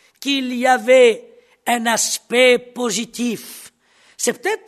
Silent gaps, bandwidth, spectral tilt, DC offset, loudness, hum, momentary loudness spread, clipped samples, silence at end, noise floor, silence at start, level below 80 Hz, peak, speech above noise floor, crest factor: none; 13.5 kHz; -1.5 dB/octave; under 0.1%; -17 LUFS; none; 16 LU; under 0.1%; 0.1 s; -55 dBFS; 0.2 s; -70 dBFS; 0 dBFS; 38 dB; 18 dB